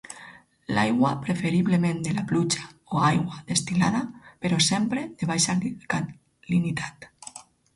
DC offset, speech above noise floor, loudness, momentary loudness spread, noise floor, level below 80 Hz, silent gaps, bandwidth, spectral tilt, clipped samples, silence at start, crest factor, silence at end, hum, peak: under 0.1%; 24 dB; -25 LUFS; 16 LU; -49 dBFS; -58 dBFS; none; 11.5 kHz; -4.5 dB/octave; under 0.1%; 0.1 s; 18 dB; 0.35 s; none; -8 dBFS